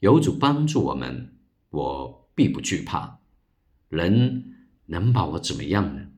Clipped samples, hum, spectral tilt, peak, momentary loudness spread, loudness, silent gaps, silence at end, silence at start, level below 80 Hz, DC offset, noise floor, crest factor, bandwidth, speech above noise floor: under 0.1%; none; -6.5 dB/octave; -4 dBFS; 14 LU; -24 LUFS; none; 0.05 s; 0 s; -48 dBFS; under 0.1%; -66 dBFS; 20 dB; 11.5 kHz; 43 dB